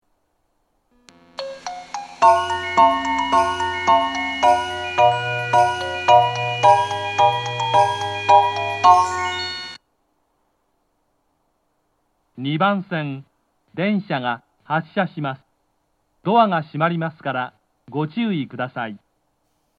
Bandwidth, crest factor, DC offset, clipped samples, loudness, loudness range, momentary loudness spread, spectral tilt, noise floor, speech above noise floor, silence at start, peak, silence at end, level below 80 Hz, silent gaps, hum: 11.5 kHz; 20 dB; under 0.1%; under 0.1%; -19 LUFS; 10 LU; 16 LU; -5 dB/octave; -69 dBFS; 48 dB; 1.4 s; 0 dBFS; 0.8 s; -60 dBFS; none; none